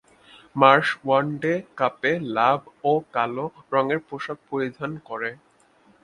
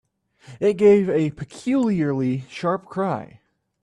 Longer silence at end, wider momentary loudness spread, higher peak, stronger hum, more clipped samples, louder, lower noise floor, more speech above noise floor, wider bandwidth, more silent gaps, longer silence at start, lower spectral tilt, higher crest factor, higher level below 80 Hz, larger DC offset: first, 0.7 s vs 0.55 s; first, 14 LU vs 11 LU; first, 0 dBFS vs -6 dBFS; neither; neither; about the same, -23 LUFS vs -21 LUFS; first, -58 dBFS vs -48 dBFS; first, 35 dB vs 28 dB; about the same, 11 kHz vs 10 kHz; neither; about the same, 0.55 s vs 0.5 s; about the same, -6.5 dB/octave vs -7.5 dB/octave; first, 24 dB vs 16 dB; second, -68 dBFS vs -60 dBFS; neither